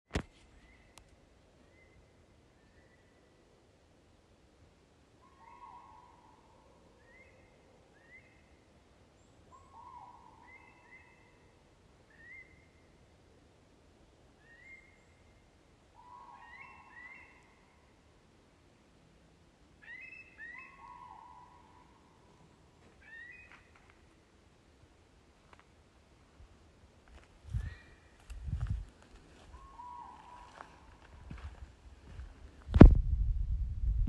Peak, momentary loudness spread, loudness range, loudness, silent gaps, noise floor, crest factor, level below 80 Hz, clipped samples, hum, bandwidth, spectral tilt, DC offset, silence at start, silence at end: -2 dBFS; 21 LU; 15 LU; -30 LUFS; none; -65 dBFS; 34 dB; -40 dBFS; under 0.1%; none; 8.2 kHz; -9 dB/octave; under 0.1%; 0.15 s; 0 s